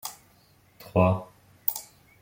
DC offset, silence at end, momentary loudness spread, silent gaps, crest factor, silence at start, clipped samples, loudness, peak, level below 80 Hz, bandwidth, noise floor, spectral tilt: under 0.1%; 0.4 s; 14 LU; none; 26 dB; 0.05 s; under 0.1%; -27 LUFS; -4 dBFS; -60 dBFS; 17 kHz; -60 dBFS; -6.5 dB/octave